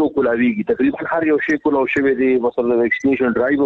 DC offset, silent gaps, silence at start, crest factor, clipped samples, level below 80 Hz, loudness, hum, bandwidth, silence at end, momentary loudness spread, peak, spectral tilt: under 0.1%; none; 0 s; 10 dB; under 0.1%; -52 dBFS; -17 LUFS; none; 7.2 kHz; 0 s; 2 LU; -8 dBFS; -7 dB/octave